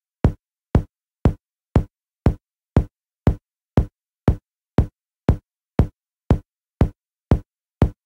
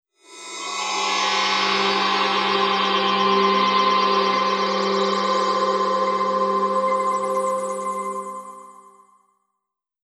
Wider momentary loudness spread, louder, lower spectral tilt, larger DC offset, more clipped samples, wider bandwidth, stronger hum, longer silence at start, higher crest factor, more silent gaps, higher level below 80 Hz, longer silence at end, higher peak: about the same, 9 LU vs 10 LU; second, -24 LUFS vs -20 LUFS; first, -9.5 dB/octave vs -3 dB/octave; neither; neither; second, 7.8 kHz vs 12 kHz; neither; about the same, 0.25 s vs 0.3 s; about the same, 18 dB vs 14 dB; neither; first, -28 dBFS vs -82 dBFS; second, 0.15 s vs 1.3 s; about the same, -4 dBFS vs -6 dBFS